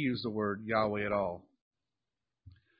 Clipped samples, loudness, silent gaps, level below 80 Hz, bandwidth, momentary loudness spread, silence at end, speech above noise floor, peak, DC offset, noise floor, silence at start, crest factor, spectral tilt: under 0.1%; -33 LUFS; 1.61-1.71 s; -64 dBFS; 5 kHz; 6 LU; 0.3 s; over 57 dB; -14 dBFS; under 0.1%; under -90 dBFS; 0 s; 20 dB; -4.5 dB/octave